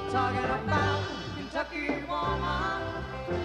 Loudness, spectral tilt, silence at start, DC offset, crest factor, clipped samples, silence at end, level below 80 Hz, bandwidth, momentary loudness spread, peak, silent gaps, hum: -31 LUFS; -6 dB/octave; 0 s; under 0.1%; 16 dB; under 0.1%; 0 s; -44 dBFS; 10.5 kHz; 8 LU; -14 dBFS; none; none